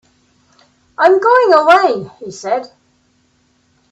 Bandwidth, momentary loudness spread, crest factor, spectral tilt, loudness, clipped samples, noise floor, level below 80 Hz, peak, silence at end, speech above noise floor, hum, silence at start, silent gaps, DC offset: 8.4 kHz; 18 LU; 14 dB; -4.5 dB/octave; -12 LUFS; under 0.1%; -58 dBFS; -62 dBFS; 0 dBFS; 1.25 s; 46 dB; none; 1 s; none; under 0.1%